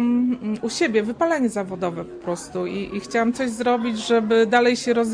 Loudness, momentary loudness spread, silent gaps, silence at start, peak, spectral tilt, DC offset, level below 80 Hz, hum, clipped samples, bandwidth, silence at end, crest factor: -22 LUFS; 10 LU; none; 0 s; -6 dBFS; -4.5 dB/octave; under 0.1%; -56 dBFS; none; under 0.1%; 10.5 kHz; 0 s; 16 dB